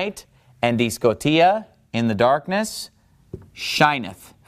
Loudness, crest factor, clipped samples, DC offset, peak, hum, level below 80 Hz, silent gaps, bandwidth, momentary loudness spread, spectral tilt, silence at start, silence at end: -20 LUFS; 18 dB; under 0.1%; under 0.1%; -2 dBFS; none; -54 dBFS; none; 15.5 kHz; 17 LU; -4.5 dB/octave; 0 s; 0.2 s